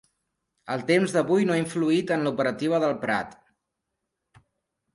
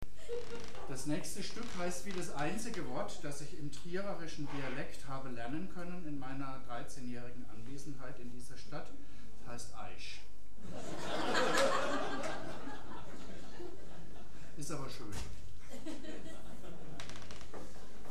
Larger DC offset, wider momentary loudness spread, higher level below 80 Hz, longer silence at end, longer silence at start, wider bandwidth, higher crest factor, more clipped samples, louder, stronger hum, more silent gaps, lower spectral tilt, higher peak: second, under 0.1% vs 3%; second, 7 LU vs 14 LU; second, -68 dBFS vs -58 dBFS; first, 1.6 s vs 0 s; first, 0.65 s vs 0 s; second, 11.5 kHz vs 15.5 kHz; second, 18 dB vs 28 dB; neither; first, -24 LUFS vs -42 LUFS; neither; neither; first, -6 dB/octave vs -4 dB/octave; first, -8 dBFS vs -18 dBFS